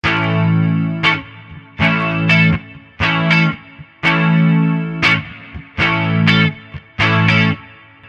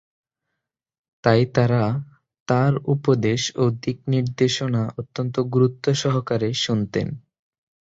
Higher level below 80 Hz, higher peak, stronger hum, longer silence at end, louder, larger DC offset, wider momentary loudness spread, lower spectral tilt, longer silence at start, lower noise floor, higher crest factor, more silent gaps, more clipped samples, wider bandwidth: first, -40 dBFS vs -54 dBFS; first, 0 dBFS vs -4 dBFS; neither; second, 0.4 s vs 0.75 s; first, -14 LUFS vs -22 LUFS; neither; first, 16 LU vs 8 LU; about the same, -6.5 dB/octave vs -6 dB/octave; second, 0.05 s vs 1.25 s; second, -40 dBFS vs -82 dBFS; about the same, 16 dB vs 20 dB; second, none vs 2.40-2.46 s; neither; about the same, 7.8 kHz vs 7.8 kHz